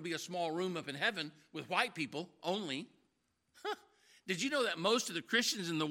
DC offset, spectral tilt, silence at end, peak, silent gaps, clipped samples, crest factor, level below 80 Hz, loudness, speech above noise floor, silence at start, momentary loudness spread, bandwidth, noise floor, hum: under 0.1%; -3 dB/octave; 0 s; -14 dBFS; none; under 0.1%; 24 dB; -88 dBFS; -36 LUFS; 43 dB; 0 s; 12 LU; 16.5 kHz; -80 dBFS; none